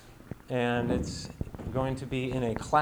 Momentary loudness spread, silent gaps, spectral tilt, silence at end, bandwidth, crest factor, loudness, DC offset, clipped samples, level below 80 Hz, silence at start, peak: 11 LU; none; -6 dB/octave; 0 s; over 20 kHz; 20 dB; -32 LUFS; under 0.1%; under 0.1%; -46 dBFS; 0 s; -10 dBFS